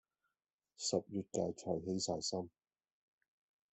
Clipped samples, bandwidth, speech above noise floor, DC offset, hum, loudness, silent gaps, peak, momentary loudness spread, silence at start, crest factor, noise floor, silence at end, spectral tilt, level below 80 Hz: under 0.1%; 8.4 kHz; over 50 dB; under 0.1%; none; -40 LUFS; none; -20 dBFS; 5 LU; 0.8 s; 22 dB; under -90 dBFS; 1.25 s; -4.5 dB/octave; -78 dBFS